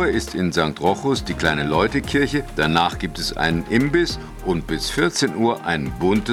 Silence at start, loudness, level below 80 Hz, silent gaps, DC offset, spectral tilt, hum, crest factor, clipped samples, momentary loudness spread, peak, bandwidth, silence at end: 0 s; -21 LUFS; -36 dBFS; none; under 0.1%; -5 dB/octave; none; 16 dB; under 0.1%; 5 LU; -4 dBFS; 16.5 kHz; 0 s